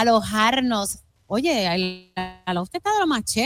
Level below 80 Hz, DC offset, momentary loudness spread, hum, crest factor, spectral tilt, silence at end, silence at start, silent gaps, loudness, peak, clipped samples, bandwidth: -50 dBFS; under 0.1%; 11 LU; none; 14 dB; -3.5 dB/octave; 0 s; 0 s; none; -23 LUFS; -8 dBFS; under 0.1%; 18 kHz